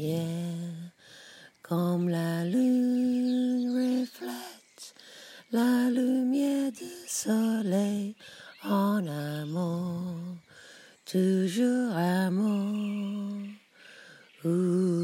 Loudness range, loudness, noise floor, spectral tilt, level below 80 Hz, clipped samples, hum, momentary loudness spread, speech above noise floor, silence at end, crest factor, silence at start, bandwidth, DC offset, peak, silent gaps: 2 LU; -29 LUFS; -53 dBFS; -6.5 dB/octave; -80 dBFS; under 0.1%; none; 20 LU; 26 dB; 0 s; 14 dB; 0 s; 16 kHz; under 0.1%; -16 dBFS; none